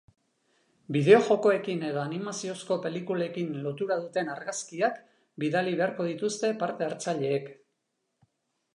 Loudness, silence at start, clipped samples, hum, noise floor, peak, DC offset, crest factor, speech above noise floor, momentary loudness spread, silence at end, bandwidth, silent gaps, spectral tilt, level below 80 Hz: -28 LUFS; 0.9 s; under 0.1%; none; -80 dBFS; -6 dBFS; under 0.1%; 24 dB; 52 dB; 12 LU; 1.2 s; 11 kHz; none; -5.5 dB/octave; -82 dBFS